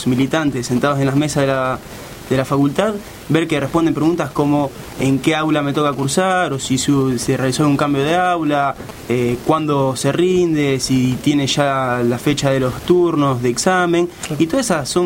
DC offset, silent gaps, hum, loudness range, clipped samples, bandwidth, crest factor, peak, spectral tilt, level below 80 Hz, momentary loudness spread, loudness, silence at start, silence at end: under 0.1%; none; none; 2 LU; under 0.1%; 16.5 kHz; 16 dB; 0 dBFS; -5.5 dB/octave; -44 dBFS; 4 LU; -17 LUFS; 0 s; 0 s